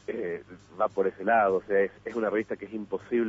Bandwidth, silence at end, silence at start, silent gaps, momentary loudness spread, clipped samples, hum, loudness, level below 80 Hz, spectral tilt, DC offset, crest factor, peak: 7.8 kHz; 0 s; 0.1 s; none; 12 LU; under 0.1%; none; -28 LUFS; -66 dBFS; -7.5 dB/octave; under 0.1%; 16 dB; -12 dBFS